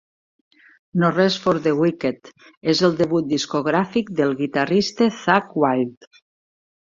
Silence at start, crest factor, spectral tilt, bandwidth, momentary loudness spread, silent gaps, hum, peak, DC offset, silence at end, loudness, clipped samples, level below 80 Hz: 0.95 s; 20 dB; -5.5 dB/octave; 7.6 kHz; 8 LU; 2.57-2.61 s; none; -2 dBFS; under 0.1%; 1 s; -20 LUFS; under 0.1%; -60 dBFS